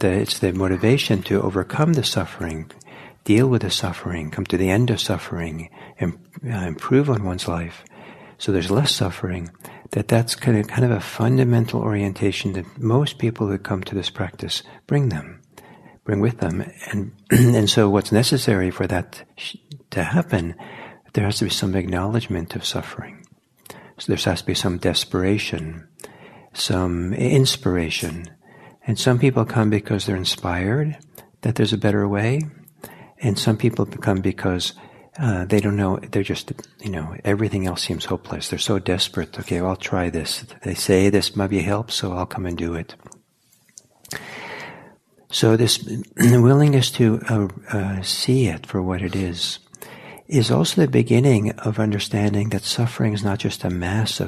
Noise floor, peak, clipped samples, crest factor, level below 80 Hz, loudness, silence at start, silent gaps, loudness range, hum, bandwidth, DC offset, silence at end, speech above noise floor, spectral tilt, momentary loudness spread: -60 dBFS; -2 dBFS; under 0.1%; 20 dB; -52 dBFS; -21 LUFS; 0 s; none; 6 LU; none; 14 kHz; under 0.1%; 0 s; 40 dB; -5.5 dB/octave; 16 LU